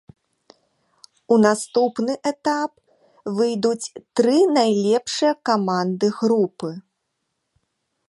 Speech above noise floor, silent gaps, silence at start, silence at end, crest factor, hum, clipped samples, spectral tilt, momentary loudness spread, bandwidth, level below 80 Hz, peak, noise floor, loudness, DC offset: 56 dB; none; 1.3 s; 1.3 s; 18 dB; none; under 0.1%; -5 dB/octave; 12 LU; 11.5 kHz; -70 dBFS; -2 dBFS; -76 dBFS; -20 LUFS; under 0.1%